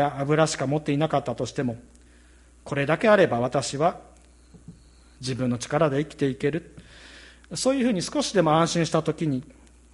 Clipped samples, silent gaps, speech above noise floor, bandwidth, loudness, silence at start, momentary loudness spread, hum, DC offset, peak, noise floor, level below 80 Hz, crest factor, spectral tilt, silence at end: under 0.1%; none; 29 dB; 11.5 kHz; -24 LUFS; 0 s; 12 LU; none; under 0.1%; -6 dBFS; -53 dBFS; -54 dBFS; 20 dB; -5.5 dB/octave; 0.5 s